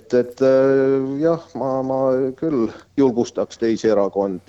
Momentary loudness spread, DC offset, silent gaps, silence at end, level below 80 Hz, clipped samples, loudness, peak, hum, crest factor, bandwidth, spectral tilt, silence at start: 7 LU; under 0.1%; none; 0.1 s; -56 dBFS; under 0.1%; -19 LUFS; -4 dBFS; none; 14 dB; 8 kHz; -7 dB/octave; 0.1 s